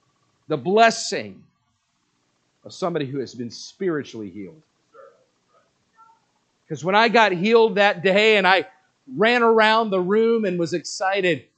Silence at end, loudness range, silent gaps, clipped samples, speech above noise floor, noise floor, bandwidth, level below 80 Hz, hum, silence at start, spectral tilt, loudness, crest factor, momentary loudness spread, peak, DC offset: 0.2 s; 15 LU; none; under 0.1%; 50 dB; -70 dBFS; 9 kHz; -76 dBFS; 60 Hz at -60 dBFS; 0.5 s; -4.5 dB/octave; -19 LUFS; 22 dB; 19 LU; 0 dBFS; under 0.1%